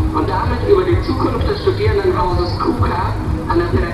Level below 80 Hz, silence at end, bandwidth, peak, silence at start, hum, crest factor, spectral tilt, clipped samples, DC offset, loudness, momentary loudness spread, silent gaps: -24 dBFS; 0 s; 12.5 kHz; 0 dBFS; 0 s; none; 16 dB; -8 dB/octave; under 0.1%; under 0.1%; -17 LUFS; 4 LU; none